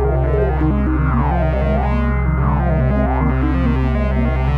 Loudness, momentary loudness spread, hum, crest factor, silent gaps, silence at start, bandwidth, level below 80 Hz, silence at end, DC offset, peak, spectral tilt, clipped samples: -17 LUFS; 1 LU; none; 10 dB; none; 0 s; 4.2 kHz; -18 dBFS; 0 s; under 0.1%; -4 dBFS; -10 dB/octave; under 0.1%